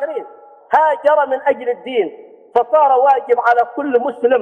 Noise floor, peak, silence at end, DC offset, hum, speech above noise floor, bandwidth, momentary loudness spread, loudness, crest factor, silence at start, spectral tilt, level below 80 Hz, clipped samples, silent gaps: -39 dBFS; -2 dBFS; 0 s; under 0.1%; none; 24 dB; 6 kHz; 8 LU; -15 LUFS; 14 dB; 0 s; -5 dB/octave; -70 dBFS; under 0.1%; none